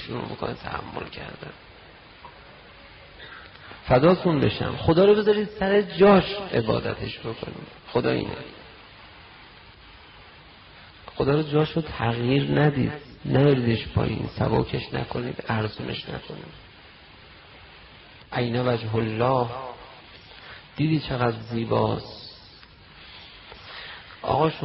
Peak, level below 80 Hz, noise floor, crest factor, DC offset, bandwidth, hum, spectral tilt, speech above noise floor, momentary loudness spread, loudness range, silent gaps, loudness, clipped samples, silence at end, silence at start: -8 dBFS; -48 dBFS; -49 dBFS; 18 dB; under 0.1%; 5.8 kHz; none; -5.5 dB/octave; 26 dB; 25 LU; 12 LU; none; -24 LUFS; under 0.1%; 0 s; 0 s